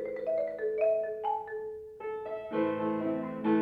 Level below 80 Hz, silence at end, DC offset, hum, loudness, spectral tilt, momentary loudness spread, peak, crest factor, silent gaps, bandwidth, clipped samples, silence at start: -70 dBFS; 0 s; under 0.1%; none; -33 LUFS; -9 dB/octave; 10 LU; -18 dBFS; 14 dB; none; 4.7 kHz; under 0.1%; 0 s